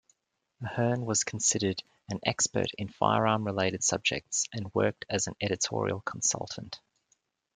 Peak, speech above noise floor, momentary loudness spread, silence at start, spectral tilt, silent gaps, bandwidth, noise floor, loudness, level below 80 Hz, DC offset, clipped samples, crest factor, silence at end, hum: -8 dBFS; 45 dB; 12 LU; 0.6 s; -3 dB/octave; none; 10.5 kHz; -75 dBFS; -29 LUFS; -66 dBFS; under 0.1%; under 0.1%; 24 dB; 0.8 s; none